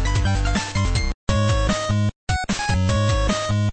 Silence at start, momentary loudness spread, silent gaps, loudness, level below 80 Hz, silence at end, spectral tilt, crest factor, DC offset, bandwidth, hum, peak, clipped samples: 0 s; 4 LU; 1.14-1.27 s, 2.16-2.27 s; -22 LUFS; -26 dBFS; 0 s; -5 dB/octave; 14 dB; under 0.1%; 8.8 kHz; none; -6 dBFS; under 0.1%